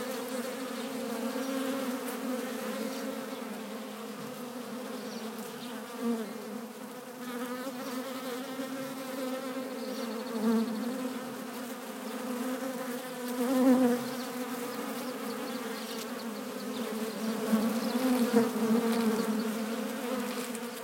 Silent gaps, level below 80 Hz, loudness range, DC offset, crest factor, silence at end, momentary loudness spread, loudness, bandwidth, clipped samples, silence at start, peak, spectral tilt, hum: none; -84 dBFS; 9 LU; under 0.1%; 22 dB; 0 s; 12 LU; -34 LUFS; 16.5 kHz; under 0.1%; 0 s; -12 dBFS; -4.5 dB/octave; none